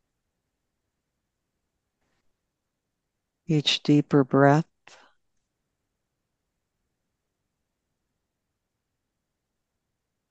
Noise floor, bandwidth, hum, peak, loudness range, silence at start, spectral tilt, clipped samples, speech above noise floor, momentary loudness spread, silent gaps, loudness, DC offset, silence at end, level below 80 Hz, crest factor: -82 dBFS; 8.4 kHz; none; -4 dBFS; 7 LU; 3.5 s; -6 dB/octave; under 0.1%; 61 dB; 7 LU; none; -22 LUFS; under 0.1%; 5.7 s; -74 dBFS; 26 dB